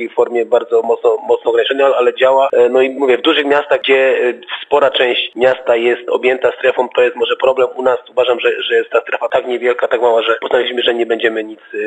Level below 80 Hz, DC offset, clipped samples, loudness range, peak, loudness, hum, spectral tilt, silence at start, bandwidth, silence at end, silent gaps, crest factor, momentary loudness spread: -62 dBFS; under 0.1%; under 0.1%; 2 LU; 0 dBFS; -13 LUFS; none; -4 dB/octave; 0 s; 8.2 kHz; 0 s; none; 12 dB; 5 LU